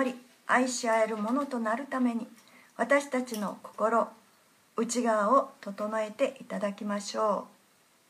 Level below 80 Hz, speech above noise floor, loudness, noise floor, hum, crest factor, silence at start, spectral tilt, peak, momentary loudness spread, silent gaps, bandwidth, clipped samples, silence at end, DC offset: -84 dBFS; 35 dB; -30 LUFS; -64 dBFS; none; 20 dB; 0 s; -4 dB/octave; -10 dBFS; 11 LU; none; 15.5 kHz; under 0.1%; 0.65 s; under 0.1%